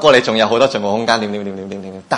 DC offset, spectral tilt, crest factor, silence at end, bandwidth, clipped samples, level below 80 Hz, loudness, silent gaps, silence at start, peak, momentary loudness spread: under 0.1%; -4 dB/octave; 16 dB; 0 s; 11 kHz; 0.2%; -56 dBFS; -15 LUFS; none; 0 s; 0 dBFS; 16 LU